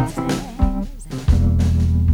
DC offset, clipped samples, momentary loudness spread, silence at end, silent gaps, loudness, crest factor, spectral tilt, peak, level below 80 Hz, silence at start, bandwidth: under 0.1%; under 0.1%; 9 LU; 0 s; none; -20 LUFS; 14 dB; -7.5 dB/octave; -4 dBFS; -22 dBFS; 0 s; 13 kHz